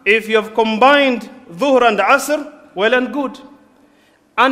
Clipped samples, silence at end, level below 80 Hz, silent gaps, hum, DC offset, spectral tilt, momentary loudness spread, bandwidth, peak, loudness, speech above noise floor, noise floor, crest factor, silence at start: under 0.1%; 0 s; -56 dBFS; none; none; under 0.1%; -3.5 dB/octave; 14 LU; 16 kHz; 0 dBFS; -15 LUFS; 39 dB; -53 dBFS; 16 dB; 0.05 s